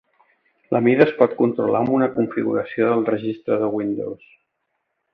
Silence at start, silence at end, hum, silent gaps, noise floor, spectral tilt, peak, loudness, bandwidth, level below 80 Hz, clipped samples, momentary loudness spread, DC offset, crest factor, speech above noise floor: 0.7 s; 1 s; none; none; -75 dBFS; -10 dB/octave; 0 dBFS; -20 LUFS; 5.4 kHz; -64 dBFS; under 0.1%; 9 LU; under 0.1%; 20 dB; 55 dB